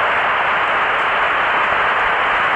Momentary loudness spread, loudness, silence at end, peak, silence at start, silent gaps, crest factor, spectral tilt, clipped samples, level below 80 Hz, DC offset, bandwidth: 1 LU; -15 LUFS; 0 s; -6 dBFS; 0 s; none; 10 dB; -3.5 dB/octave; under 0.1%; -46 dBFS; under 0.1%; 9.4 kHz